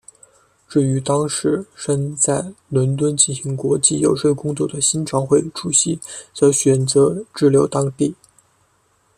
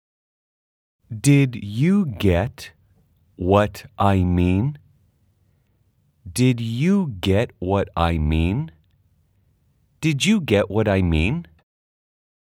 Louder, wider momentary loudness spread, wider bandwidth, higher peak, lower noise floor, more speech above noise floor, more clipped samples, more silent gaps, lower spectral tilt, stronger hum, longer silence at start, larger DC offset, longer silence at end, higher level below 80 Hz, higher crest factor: about the same, -18 LUFS vs -20 LUFS; about the same, 8 LU vs 10 LU; second, 13.5 kHz vs 16 kHz; about the same, 0 dBFS vs -2 dBFS; about the same, -61 dBFS vs -63 dBFS; about the same, 43 dB vs 44 dB; neither; neither; second, -5 dB/octave vs -6.5 dB/octave; neither; second, 0.7 s vs 1.1 s; neither; about the same, 1.05 s vs 1.1 s; second, -56 dBFS vs -40 dBFS; about the same, 18 dB vs 20 dB